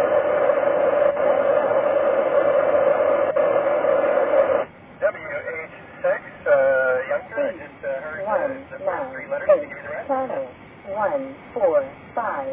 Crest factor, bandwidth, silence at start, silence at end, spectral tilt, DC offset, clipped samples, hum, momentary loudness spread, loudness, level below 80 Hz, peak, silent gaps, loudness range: 16 dB; 3.7 kHz; 0 s; 0 s; -9 dB/octave; under 0.1%; under 0.1%; none; 12 LU; -21 LUFS; -58 dBFS; -6 dBFS; none; 6 LU